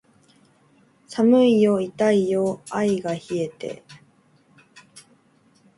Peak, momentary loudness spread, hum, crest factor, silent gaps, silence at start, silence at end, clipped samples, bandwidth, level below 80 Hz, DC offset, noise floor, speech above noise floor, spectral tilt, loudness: -6 dBFS; 18 LU; none; 18 dB; none; 1.1 s; 0.8 s; under 0.1%; 11.5 kHz; -68 dBFS; under 0.1%; -59 dBFS; 39 dB; -6.5 dB/octave; -21 LUFS